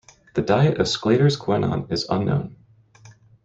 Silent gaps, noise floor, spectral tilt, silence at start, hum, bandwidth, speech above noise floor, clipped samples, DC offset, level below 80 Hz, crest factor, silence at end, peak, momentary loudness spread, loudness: none; -50 dBFS; -6.5 dB/octave; 0.35 s; none; 8 kHz; 30 dB; under 0.1%; under 0.1%; -52 dBFS; 18 dB; 0.35 s; -4 dBFS; 8 LU; -21 LUFS